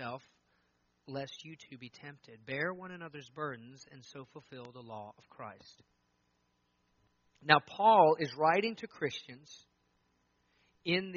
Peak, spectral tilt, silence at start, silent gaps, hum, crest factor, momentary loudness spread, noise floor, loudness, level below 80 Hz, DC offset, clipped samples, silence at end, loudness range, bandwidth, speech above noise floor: -6 dBFS; -2.5 dB/octave; 0 s; none; 60 Hz at -75 dBFS; 30 dB; 25 LU; -77 dBFS; -31 LUFS; -80 dBFS; under 0.1%; under 0.1%; 0 s; 21 LU; 7 kHz; 43 dB